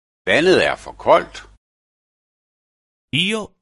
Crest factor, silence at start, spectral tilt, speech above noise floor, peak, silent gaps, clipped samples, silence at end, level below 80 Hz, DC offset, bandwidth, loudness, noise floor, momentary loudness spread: 20 dB; 0.25 s; -4.5 dB/octave; over 73 dB; 0 dBFS; 1.57-3.08 s; under 0.1%; 0.15 s; -50 dBFS; under 0.1%; 11.5 kHz; -17 LUFS; under -90 dBFS; 9 LU